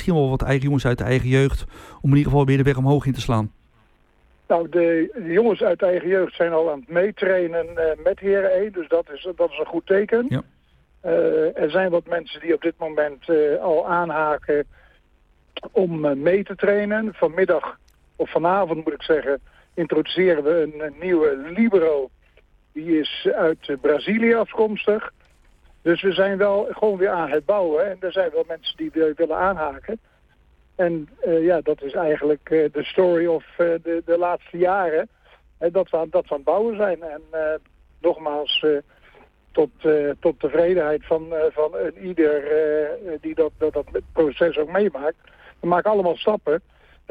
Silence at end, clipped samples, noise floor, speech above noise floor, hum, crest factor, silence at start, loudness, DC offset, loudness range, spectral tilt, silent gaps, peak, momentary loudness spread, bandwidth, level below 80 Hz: 0.5 s; under 0.1%; -58 dBFS; 38 dB; none; 14 dB; 0 s; -21 LUFS; under 0.1%; 2 LU; -7.5 dB/octave; none; -6 dBFS; 8 LU; 9.6 kHz; -44 dBFS